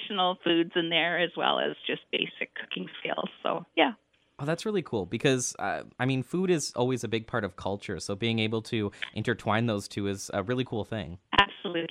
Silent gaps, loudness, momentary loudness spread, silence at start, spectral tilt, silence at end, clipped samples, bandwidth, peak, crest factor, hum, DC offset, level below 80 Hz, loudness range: none; -29 LUFS; 9 LU; 0 s; -4.5 dB/octave; 0.05 s; under 0.1%; 15.5 kHz; -4 dBFS; 26 dB; none; under 0.1%; -60 dBFS; 2 LU